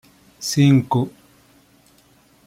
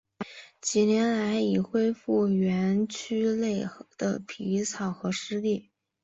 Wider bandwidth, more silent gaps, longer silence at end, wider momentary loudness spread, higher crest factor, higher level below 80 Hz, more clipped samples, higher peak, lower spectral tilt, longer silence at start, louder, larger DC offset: first, 15.5 kHz vs 8.2 kHz; neither; first, 1.35 s vs 0.4 s; first, 14 LU vs 9 LU; about the same, 16 dB vs 16 dB; first, -60 dBFS vs -66 dBFS; neither; first, -4 dBFS vs -12 dBFS; about the same, -6 dB/octave vs -5.5 dB/octave; first, 0.4 s vs 0.2 s; first, -19 LUFS vs -28 LUFS; neither